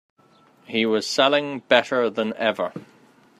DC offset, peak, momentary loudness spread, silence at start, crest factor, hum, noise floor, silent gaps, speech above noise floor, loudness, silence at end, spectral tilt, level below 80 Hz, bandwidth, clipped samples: under 0.1%; 0 dBFS; 10 LU; 0.7 s; 22 dB; none; -56 dBFS; none; 34 dB; -22 LUFS; 0.55 s; -3.5 dB/octave; -72 dBFS; 14.5 kHz; under 0.1%